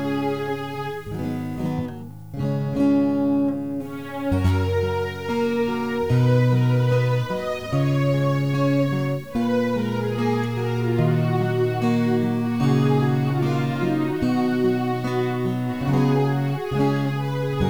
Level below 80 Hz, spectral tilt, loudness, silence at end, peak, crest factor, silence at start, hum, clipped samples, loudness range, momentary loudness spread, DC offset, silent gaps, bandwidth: -46 dBFS; -8 dB/octave; -22 LUFS; 0 s; -8 dBFS; 14 dB; 0 s; none; under 0.1%; 3 LU; 8 LU; 0.6%; none; over 20 kHz